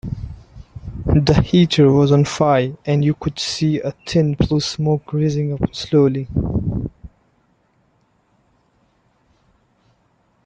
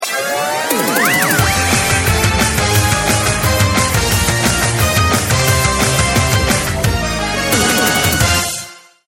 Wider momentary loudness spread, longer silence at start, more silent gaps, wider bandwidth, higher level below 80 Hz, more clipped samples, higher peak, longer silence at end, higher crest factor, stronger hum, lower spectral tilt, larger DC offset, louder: first, 14 LU vs 5 LU; about the same, 0.05 s vs 0 s; neither; second, 9 kHz vs 18 kHz; second, -36 dBFS vs -26 dBFS; neither; about the same, 0 dBFS vs 0 dBFS; first, 3.4 s vs 0.3 s; about the same, 18 dB vs 14 dB; neither; first, -6.5 dB/octave vs -3.5 dB/octave; neither; second, -18 LUFS vs -13 LUFS